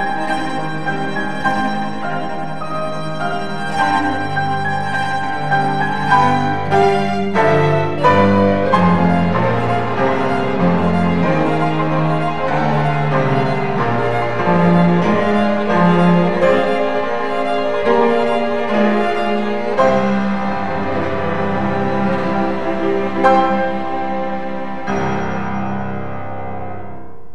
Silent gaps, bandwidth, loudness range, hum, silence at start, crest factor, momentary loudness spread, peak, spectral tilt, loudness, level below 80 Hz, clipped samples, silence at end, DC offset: none; 10 kHz; 6 LU; none; 0 s; 16 dB; 9 LU; 0 dBFS; -7.5 dB/octave; -17 LUFS; -46 dBFS; under 0.1%; 0.15 s; 6%